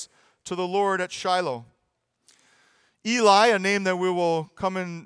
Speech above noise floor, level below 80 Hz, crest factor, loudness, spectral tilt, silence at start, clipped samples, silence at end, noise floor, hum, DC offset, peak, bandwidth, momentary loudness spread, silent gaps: 52 dB; -68 dBFS; 20 dB; -23 LUFS; -4 dB/octave; 0 s; under 0.1%; 0 s; -75 dBFS; none; under 0.1%; -4 dBFS; 10.5 kHz; 17 LU; none